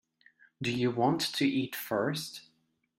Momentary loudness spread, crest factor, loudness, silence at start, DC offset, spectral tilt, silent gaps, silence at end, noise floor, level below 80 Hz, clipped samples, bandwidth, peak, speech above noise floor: 9 LU; 18 dB; -31 LUFS; 0.6 s; under 0.1%; -5 dB/octave; none; 0.55 s; -74 dBFS; -70 dBFS; under 0.1%; 16 kHz; -14 dBFS; 43 dB